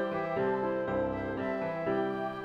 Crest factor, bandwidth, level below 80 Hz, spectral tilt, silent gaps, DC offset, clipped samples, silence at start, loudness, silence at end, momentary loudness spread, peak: 12 dB; 6.8 kHz; -58 dBFS; -8.5 dB/octave; none; under 0.1%; under 0.1%; 0 s; -32 LUFS; 0 s; 3 LU; -20 dBFS